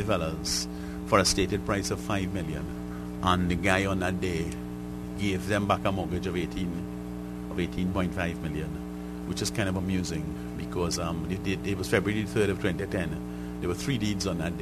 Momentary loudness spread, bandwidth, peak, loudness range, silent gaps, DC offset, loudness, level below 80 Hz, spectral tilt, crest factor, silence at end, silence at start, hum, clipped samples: 11 LU; 13.5 kHz; -6 dBFS; 4 LU; none; under 0.1%; -29 LUFS; -44 dBFS; -5 dB/octave; 22 dB; 0 s; 0 s; 60 Hz at -40 dBFS; under 0.1%